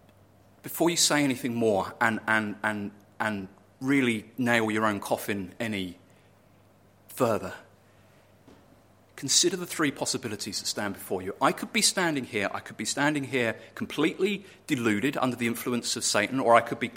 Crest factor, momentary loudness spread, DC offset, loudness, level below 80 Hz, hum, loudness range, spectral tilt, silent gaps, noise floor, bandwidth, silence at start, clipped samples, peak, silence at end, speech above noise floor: 24 dB; 13 LU; under 0.1%; -27 LUFS; -68 dBFS; none; 7 LU; -3 dB/octave; none; -59 dBFS; 16.5 kHz; 0.65 s; under 0.1%; -4 dBFS; 0 s; 32 dB